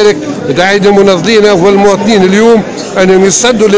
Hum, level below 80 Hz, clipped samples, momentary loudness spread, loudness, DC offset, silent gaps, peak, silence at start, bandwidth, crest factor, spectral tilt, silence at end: none; -38 dBFS; 9%; 5 LU; -6 LUFS; under 0.1%; none; 0 dBFS; 0 s; 8 kHz; 6 dB; -4.5 dB/octave; 0 s